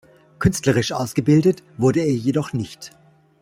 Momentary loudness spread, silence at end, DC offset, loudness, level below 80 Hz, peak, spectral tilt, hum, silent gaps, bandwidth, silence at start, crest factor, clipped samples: 13 LU; 0.55 s; under 0.1%; -20 LUFS; -46 dBFS; -2 dBFS; -6 dB/octave; none; none; 16 kHz; 0.4 s; 18 dB; under 0.1%